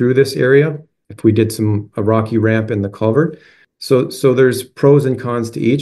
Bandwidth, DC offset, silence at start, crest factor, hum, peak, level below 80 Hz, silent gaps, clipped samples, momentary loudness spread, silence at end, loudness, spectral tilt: 12.5 kHz; under 0.1%; 0 s; 14 dB; none; 0 dBFS; -56 dBFS; none; under 0.1%; 8 LU; 0 s; -15 LUFS; -7 dB/octave